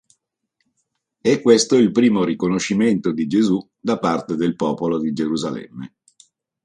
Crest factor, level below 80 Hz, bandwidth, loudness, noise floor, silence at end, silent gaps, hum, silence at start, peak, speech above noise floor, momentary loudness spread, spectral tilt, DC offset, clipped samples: 18 dB; -58 dBFS; 11 kHz; -19 LUFS; -74 dBFS; 0.8 s; none; none; 1.25 s; 0 dBFS; 55 dB; 10 LU; -5.5 dB/octave; under 0.1%; under 0.1%